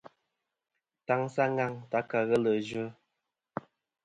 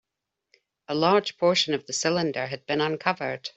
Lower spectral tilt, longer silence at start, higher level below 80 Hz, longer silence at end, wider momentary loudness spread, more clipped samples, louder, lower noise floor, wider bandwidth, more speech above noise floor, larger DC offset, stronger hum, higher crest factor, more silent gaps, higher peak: first, -7 dB/octave vs -3.5 dB/octave; first, 1.1 s vs 0.9 s; second, -74 dBFS vs -68 dBFS; first, 1.15 s vs 0.05 s; first, 16 LU vs 8 LU; neither; second, -30 LUFS vs -25 LUFS; about the same, -86 dBFS vs -84 dBFS; first, 11 kHz vs 8.2 kHz; about the same, 56 dB vs 59 dB; neither; neither; about the same, 20 dB vs 20 dB; neither; second, -12 dBFS vs -6 dBFS